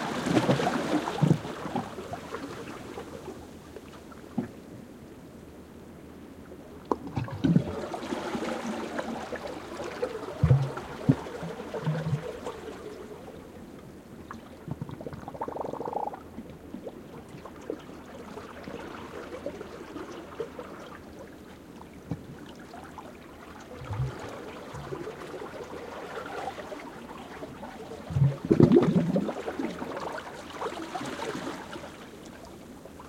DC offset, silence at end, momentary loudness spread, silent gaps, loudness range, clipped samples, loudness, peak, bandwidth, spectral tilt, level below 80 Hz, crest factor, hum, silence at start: under 0.1%; 0 s; 20 LU; none; 15 LU; under 0.1%; -32 LUFS; -4 dBFS; 16.5 kHz; -7 dB/octave; -56 dBFS; 28 dB; none; 0 s